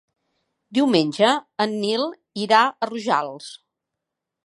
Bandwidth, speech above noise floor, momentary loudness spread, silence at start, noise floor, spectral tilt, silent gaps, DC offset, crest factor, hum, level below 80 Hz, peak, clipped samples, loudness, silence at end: 11.5 kHz; 63 dB; 13 LU; 0.7 s; -83 dBFS; -4.5 dB/octave; none; under 0.1%; 22 dB; none; -74 dBFS; -2 dBFS; under 0.1%; -21 LUFS; 0.9 s